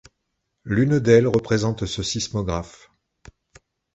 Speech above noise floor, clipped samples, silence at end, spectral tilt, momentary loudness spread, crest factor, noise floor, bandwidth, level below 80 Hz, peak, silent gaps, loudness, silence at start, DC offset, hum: 56 dB; under 0.1%; 1.25 s; -5.5 dB/octave; 13 LU; 20 dB; -76 dBFS; 8.2 kHz; -44 dBFS; -2 dBFS; none; -21 LUFS; 0.65 s; under 0.1%; none